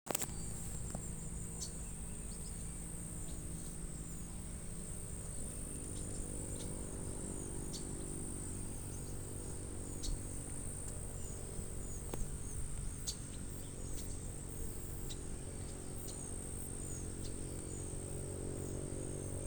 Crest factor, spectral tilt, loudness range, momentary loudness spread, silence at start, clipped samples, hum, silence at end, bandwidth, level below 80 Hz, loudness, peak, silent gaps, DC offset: 32 dB; -4.5 dB/octave; 2 LU; 3 LU; 0.05 s; under 0.1%; none; 0 s; over 20 kHz; -48 dBFS; -44 LUFS; -12 dBFS; none; under 0.1%